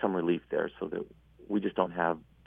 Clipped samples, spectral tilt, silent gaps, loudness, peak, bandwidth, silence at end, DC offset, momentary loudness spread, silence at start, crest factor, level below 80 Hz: under 0.1%; -9 dB/octave; none; -32 LUFS; -10 dBFS; 3.8 kHz; 0.25 s; under 0.1%; 8 LU; 0 s; 22 dB; -64 dBFS